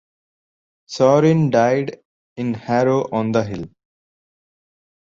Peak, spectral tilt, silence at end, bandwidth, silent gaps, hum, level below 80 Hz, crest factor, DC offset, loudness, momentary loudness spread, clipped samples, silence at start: -2 dBFS; -7 dB/octave; 1.35 s; 7.6 kHz; 2.05-2.36 s; none; -56 dBFS; 18 dB; under 0.1%; -18 LUFS; 16 LU; under 0.1%; 0.9 s